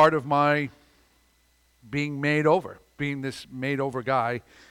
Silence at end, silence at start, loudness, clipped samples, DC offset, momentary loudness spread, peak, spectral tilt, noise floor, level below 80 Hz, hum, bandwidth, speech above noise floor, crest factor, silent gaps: 0.3 s; 0 s; -26 LUFS; under 0.1%; under 0.1%; 12 LU; -6 dBFS; -6.5 dB/octave; -64 dBFS; -62 dBFS; none; 15.5 kHz; 39 dB; 20 dB; none